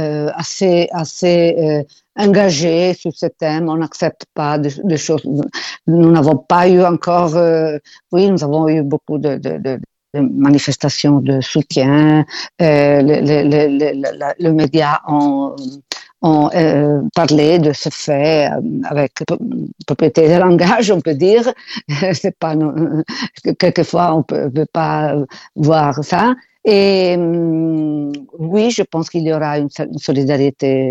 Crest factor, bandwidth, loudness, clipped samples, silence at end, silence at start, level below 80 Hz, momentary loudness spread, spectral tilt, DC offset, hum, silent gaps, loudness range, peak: 14 dB; 8.2 kHz; -14 LUFS; under 0.1%; 0 s; 0 s; -52 dBFS; 10 LU; -6.5 dB/octave; under 0.1%; none; none; 4 LU; 0 dBFS